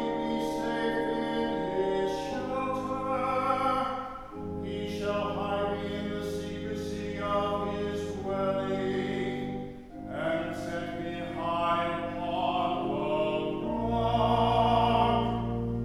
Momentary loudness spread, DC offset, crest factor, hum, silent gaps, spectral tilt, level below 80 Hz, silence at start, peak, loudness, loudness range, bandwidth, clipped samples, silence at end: 10 LU; under 0.1%; 18 dB; none; none; -6.5 dB/octave; -48 dBFS; 0 s; -12 dBFS; -30 LUFS; 5 LU; 15 kHz; under 0.1%; 0 s